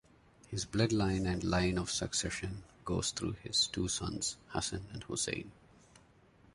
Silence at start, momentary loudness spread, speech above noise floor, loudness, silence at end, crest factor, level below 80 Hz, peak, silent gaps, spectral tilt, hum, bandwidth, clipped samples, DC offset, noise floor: 0.5 s; 11 LU; 28 dB; -35 LUFS; 1 s; 20 dB; -52 dBFS; -16 dBFS; none; -3.5 dB/octave; none; 11.5 kHz; under 0.1%; under 0.1%; -64 dBFS